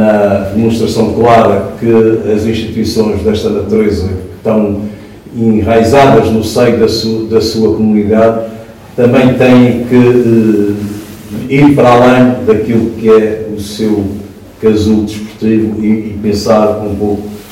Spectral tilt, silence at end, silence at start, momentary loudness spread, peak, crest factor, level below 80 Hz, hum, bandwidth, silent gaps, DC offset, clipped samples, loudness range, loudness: -7 dB/octave; 0 s; 0 s; 13 LU; 0 dBFS; 8 dB; -38 dBFS; none; 16 kHz; none; under 0.1%; 3%; 4 LU; -9 LUFS